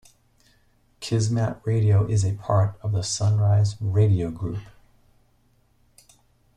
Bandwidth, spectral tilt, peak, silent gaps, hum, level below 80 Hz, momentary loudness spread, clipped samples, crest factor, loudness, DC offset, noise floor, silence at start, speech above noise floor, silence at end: 10 kHz; -6.5 dB/octave; -8 dBFS; none; none; -52 dBFS; 9 LU; under 0.1%; 16 dB; -23 LUFS; under 0.1%; -62 dBFS; 1 s; 41 dB; 1.9 s